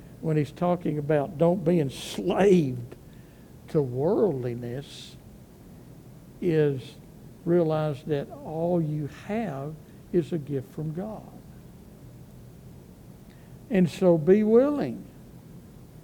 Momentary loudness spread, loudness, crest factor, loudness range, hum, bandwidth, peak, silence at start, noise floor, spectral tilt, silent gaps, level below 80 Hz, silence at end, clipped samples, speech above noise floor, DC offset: 25 LU; -26 LUFS; 20 dB; 9 LU; none; 19 kHz; -8 dBFS; 0 s; -48 dBFS; -8 dB/octave; none; -56 dBFS; 0.05 s; under 0.1%; 23 dB; under 0.1%